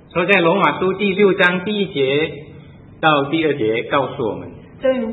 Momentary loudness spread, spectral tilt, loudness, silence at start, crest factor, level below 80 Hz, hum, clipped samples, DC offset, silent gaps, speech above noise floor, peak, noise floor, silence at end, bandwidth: 11 LU; -7.5 dB/octave; -17 LUFS; 0.15 s; 18 dB; -54 dBFS; none; under 0.1%; under 0.1%; none; 23 dB; 0 dBFS; -40 dBFS; 0 s; 4.4 kHz